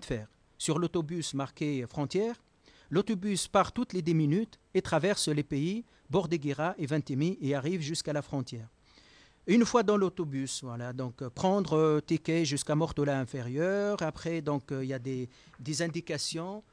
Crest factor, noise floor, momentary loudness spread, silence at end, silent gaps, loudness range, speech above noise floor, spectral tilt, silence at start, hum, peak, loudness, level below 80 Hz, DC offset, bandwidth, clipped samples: 18 dB; -60 dBFS; 10 LU; 0.1 s; none; 4 LU; 29 dB; -5.5 dB/octave; 0 s; none; -12 dBFS; -31 LUFS; -60 dBFS; under 0.1%; 10.5 kHz; under 0.1%